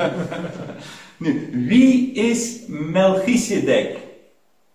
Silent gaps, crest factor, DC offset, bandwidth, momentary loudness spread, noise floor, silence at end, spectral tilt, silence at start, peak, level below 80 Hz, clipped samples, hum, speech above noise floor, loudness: none; 16 dB; 0.1%; 14.5 kHz; 19 LU; -60 dBFS; 0.6 s; -5 dB/octave; 0 s; -4 dBFS; -56 dBFS; under 0.1%; none; 42 dB; -19 LUFS